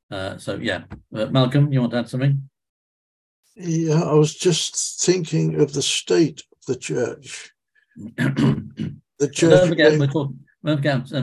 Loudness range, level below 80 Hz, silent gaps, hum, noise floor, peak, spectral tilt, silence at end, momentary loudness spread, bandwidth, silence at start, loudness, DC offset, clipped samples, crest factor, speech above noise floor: 4 LU; -54 dBFS; 2.69-3.43 s; none; under -90 dBFS; -2 dBFS; -5 dB/octave; 0 s; 16 LU; 12 kHz; 0.1 s; -20 LUFS; under 0.1%; under 0.1%; 20 dB; over 70 dB